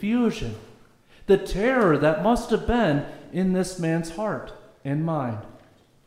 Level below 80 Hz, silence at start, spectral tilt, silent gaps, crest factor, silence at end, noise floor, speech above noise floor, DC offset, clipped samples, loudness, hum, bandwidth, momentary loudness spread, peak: -42 dBFS; 0 s; -6.5 dB/octave; none; 16 dB; 0.5 s; -55 dBFS; 32 dB; under 0.1%; under 0.1%; -24 LUFS; none; 15 kHz; 15 LU; -8 dBFS